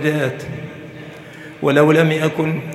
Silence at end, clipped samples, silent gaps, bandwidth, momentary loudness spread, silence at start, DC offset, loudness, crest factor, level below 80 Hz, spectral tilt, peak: 0 s; under 0.1%; none; 14.5 kHz; 22 LU; 0 s; under 0.1%; -16 LUFS; 18 dB; -60 dBFS; -6.5 dB/octave; 0 dBFS